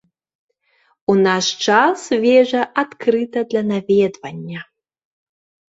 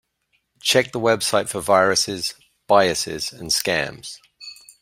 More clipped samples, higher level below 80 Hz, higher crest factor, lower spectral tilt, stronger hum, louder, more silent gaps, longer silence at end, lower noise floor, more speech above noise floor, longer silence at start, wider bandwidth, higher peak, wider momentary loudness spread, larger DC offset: neither; second, -64 dBFS vs -56 dBFS; about the same, 18 dB vs 20 dB; first, -4.5 dB/octave vs -2.5 dB/octave; neither; first, -17 LUFS vs -20 LUFS; neither; first, 1.1 s vs 0.3 s; second, -61 dBFS vs -69 dBFS; second, 45 dB vs 49 dB; first, 1.1 s vs 0.65 s; second, 8 kHz vs 16 kHz; about the same, -2 dBFS vs -2 dBFS; second, 15 LU vs 20 LU; neither